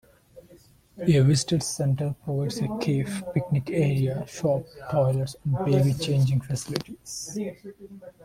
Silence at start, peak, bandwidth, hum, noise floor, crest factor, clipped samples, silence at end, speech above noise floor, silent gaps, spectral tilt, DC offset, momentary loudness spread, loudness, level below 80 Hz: 0.35 s; -6 dBFS; 15 kHz; none; -55 dBFS; 20 dB; under 0.1%; 0.15 s; 30 dB; none; -6 dB/octave; under 0.1%; 12 LU; -26 LUFS; -54 dBFS